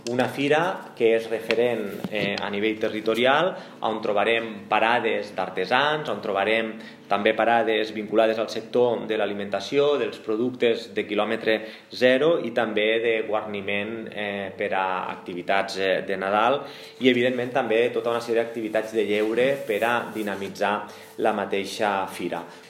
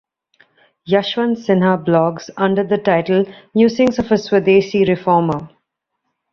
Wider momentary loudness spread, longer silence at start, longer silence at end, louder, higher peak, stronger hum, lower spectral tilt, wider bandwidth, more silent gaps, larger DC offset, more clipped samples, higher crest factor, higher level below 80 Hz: first, 9 LU vs 6 LU; second, 0.05 s vs 0.85 s; second, 0 s vs 0.85 s; second, -24 LUFS vs -16 LUFS; about the same, -4 dBFS vs -2 dBFS; neither; second, -5 dB/octave vs -7 dB/octave; first, 16 kHz vs 7 kHz; neither; neither; neither; first, 20 dB vs 14 dB; second, -76 dBFS vs -52 dBFS